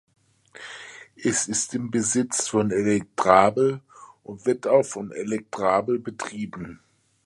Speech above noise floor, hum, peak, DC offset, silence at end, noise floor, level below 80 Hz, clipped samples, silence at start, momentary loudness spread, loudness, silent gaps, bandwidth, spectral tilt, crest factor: 23 dB; none; 0 dBFS; under 0.1%; 0.5 s; -46 dBFS; -60 dBFS; under 0.1%; 0.55 s; 20 LU; -23 LUFS; none; 11.5 kHz; -4 dB/octave; 24 dB